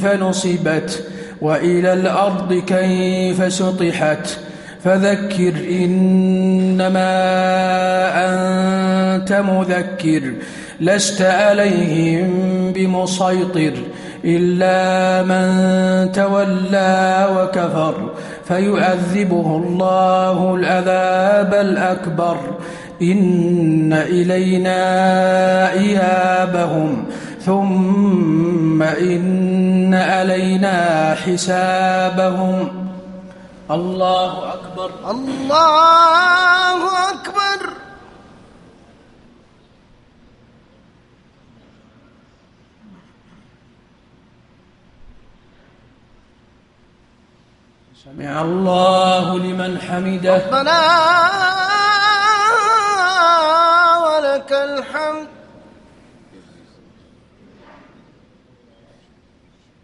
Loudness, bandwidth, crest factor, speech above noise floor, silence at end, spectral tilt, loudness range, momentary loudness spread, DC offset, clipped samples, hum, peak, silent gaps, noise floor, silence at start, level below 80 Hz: -15 LUFS; 11.5 kHz; 16 dB; 38 dB; 4.55 s; -5.5 dB/octave; 6 LU; 10 LU; under 0.1%; under 0.1%; none; 0 dBFS; none; -53 dBFS; 0 s; -54 dBFS